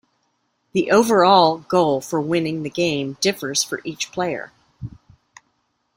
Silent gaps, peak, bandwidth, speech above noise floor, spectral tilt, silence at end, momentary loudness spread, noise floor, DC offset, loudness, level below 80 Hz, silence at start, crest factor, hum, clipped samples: none; -2 dBFS; 16.5 kHz; 50 dB; -4 dB/octave; 1.05 s; 21 LU; -69 dBFS; under 0.1%; -19 LUFS; -58 dBFS; 0.75 s; 20 dB; none; under 0.1%